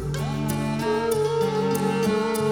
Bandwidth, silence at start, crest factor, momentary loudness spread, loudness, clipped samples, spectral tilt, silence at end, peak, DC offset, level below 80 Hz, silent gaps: over 20 kHz; 0 s; 14 dB; 3 LU; -24 LUFS; under 0.1%; -6 dB/octave; 0 s; -10 dBFS; 0.1%; -46 dBFS; none